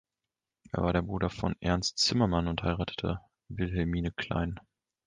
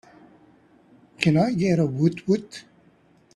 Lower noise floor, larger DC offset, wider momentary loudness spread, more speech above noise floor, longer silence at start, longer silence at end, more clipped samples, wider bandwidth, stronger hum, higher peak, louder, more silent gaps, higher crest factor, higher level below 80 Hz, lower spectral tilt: first, -89 dBFS vs -58 dBFS; neither; about the same, 10 LU vs 12 LU; first, 59 dB vs 36 dB; second, 0.75 s vs 1.2 s; second, 0.45 s vs 0.75 s; neither; second, 9.8 kHz vs 11 kHz; neither; second, -12 dBFS vs -4 dBFS; second, -31 LUFS vs -22 LUFS; neither; about the same, 20 dB vs 22 dB; first, -44 dBFS vs -60 dBFS; second, -5 dB/octave vs -7 dB/octave